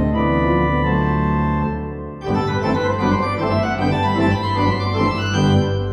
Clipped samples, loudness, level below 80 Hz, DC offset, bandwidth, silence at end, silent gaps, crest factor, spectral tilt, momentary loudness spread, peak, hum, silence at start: under 0.1%; -19 LUFS; -32 dBFS; under 0.1%; 9 kHz; 0 s; none; 14 dB; -7 dB/octave; 5 LU; -4 dBFS; none; 0 s